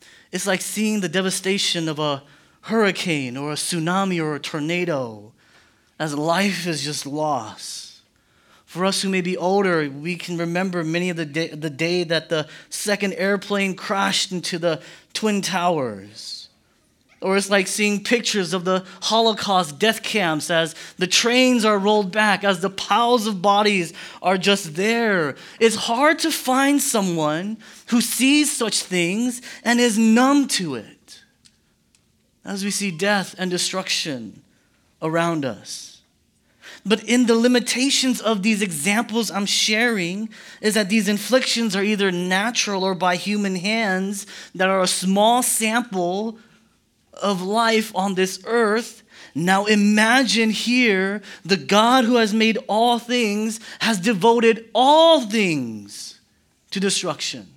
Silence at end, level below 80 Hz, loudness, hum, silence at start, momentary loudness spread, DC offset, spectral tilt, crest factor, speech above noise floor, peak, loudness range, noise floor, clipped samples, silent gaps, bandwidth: 0.1 s; -72 dBFS; -20 LUFS; none; 0.35 s; 11 LU; under 0.1%; -3.5 dB/octave; 20 dB; 42 dB; -2 dBFS; 6 LU; -63 dBFS; under 0.1%; none; 18 kHz